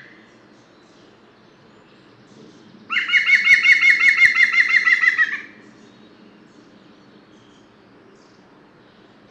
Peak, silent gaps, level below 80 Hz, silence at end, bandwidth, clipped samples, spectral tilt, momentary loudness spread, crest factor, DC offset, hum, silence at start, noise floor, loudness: 0 dBFS; none; -66 dBFS; 3.85 s; 13 kHz; under 0.1%; 0 dB/octave; 10 LU; 20 dB; under 0.1%; none; 2.9 s; -50 dBFS; -13 LUFS